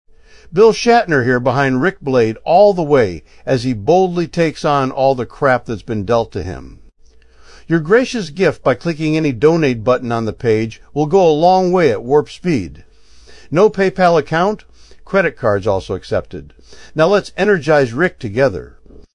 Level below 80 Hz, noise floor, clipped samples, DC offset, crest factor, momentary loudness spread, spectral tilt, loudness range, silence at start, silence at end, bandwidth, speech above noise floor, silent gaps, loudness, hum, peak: -42 dBFS; -45 dBFS; under 0.1%; 0.3%; 14 dB; 9 LU; -6.5 dB/octave; 4 LU; 0.5 s; 0.15 s; 11 kHz; 31 dB; none; -15 LUFS; none; 0 dBFS